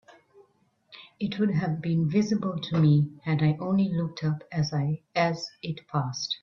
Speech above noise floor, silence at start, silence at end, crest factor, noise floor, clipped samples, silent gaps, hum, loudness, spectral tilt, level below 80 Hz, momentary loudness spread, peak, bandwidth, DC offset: 41 dB; 0.1 s; 0.05 s; 16 dB; -67 dBFS; under 0.1%; none; none; -27 LUFS; -7 dB/octave; -62 dBFS; 8 LU; -10 dBFS; 7 kHz; under 0.1%